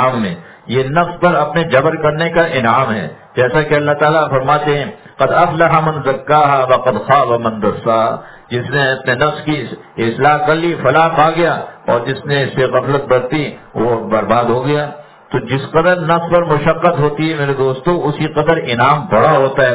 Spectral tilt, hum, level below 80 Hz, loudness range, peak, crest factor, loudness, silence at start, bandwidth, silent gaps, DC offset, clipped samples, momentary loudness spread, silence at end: -10 dB/octave; none; -46 dBFS; 3 LU; 0 dBFS; 14 dB; -14 LUFS; 0 s; 4 kHz; none; under 0.1%; under 0.1%; 8 LU; 0 s